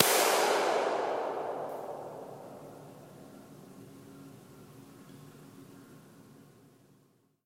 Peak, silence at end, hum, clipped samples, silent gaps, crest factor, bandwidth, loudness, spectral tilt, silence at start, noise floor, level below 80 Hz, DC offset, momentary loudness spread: -2 dBFS; 1.25 s; none; under 0.1%; none; 34 dB; 16.5 kHz; -30 LUFS; -2 dB/octave; 0 s; -68 dBFS; -80 dBFS; under 0.1%; 26 LU